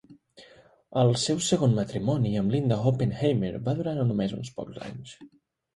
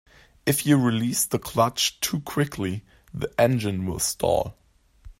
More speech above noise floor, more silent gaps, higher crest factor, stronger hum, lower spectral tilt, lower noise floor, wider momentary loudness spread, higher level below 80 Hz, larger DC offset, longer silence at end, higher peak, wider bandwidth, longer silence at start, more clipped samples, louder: first, 30 dB vs 25 dB; neither; about the same, 18 dB vs 18 dB; neither; first, -6 dB/octave vs -4.5 dB/octave; first, -56 dBFS vs -48 dBFS; first, 15 LU vs 10 LU; second, -56 dBFS vs -50 dBFS; neither; first, 0.5 s vs 0.1 s; second, -10 dBFS vs -6 dBFS; second, 11.5 kHz vs 16.5 kHz; second, 0.1 s vs 0.45 s; neither; about the same, -26 LUFS vs -24 LUFS